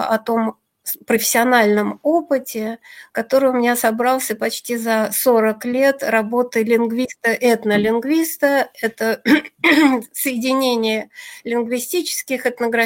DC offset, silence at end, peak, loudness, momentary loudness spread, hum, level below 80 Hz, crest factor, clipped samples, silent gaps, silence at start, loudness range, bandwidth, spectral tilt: under 0.1%; 0 s; -2 dBFS; -18 LUFS; 10 LU; none; -62 dBFS; 16 dB; under 0.1%; none; 0 s; 2 LU; 16.5 kHz; -3.5 dB/octave